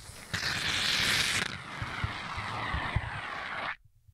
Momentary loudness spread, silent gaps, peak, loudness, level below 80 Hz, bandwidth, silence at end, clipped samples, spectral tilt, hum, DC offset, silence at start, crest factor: 12 LU; none; -14 dBFS; -31 LUFS; -48 dBFS; 16 kHz; 0.4 s; under 0.1%; -2 dB/octave; none; under 0.1%; 0 s; 20 dB